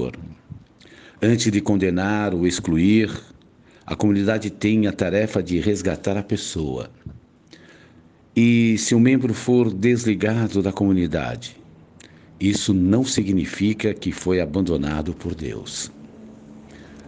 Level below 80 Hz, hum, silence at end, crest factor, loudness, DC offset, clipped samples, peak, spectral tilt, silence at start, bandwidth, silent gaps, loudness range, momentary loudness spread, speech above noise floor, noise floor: -48 dBFS; none; 0 s; 16 dB; -21 LUFS; under 0.1%; under 0.1%; -4 dBFS; -5.5 dB/octave; 0 s; 9.8 kHz; none; 5 LU; 13 LU; 31 dB; -51 dBFS